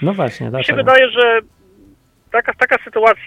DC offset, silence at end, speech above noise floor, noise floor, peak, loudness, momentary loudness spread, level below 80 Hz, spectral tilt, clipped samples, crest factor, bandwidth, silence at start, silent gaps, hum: under 0.1%; 0 s; 36 dB; -50 dBFS; 0 dBFS; -14 LUFS; 9 LU; -54 dBFS; -6 dB/octave; under 0.1%; 16 dB; 10 kHz; 0 s; none; none